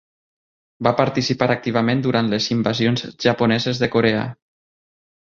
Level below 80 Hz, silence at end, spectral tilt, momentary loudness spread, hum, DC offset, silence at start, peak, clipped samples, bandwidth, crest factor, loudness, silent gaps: -54 dBFS; 0.95 s; -6 dB/octave; 3 LU; none; under 0.1%; 0.8 s; 0 dBFS; under 0.1%; 7.4 kHz; 20 dB; -19 LUFS; none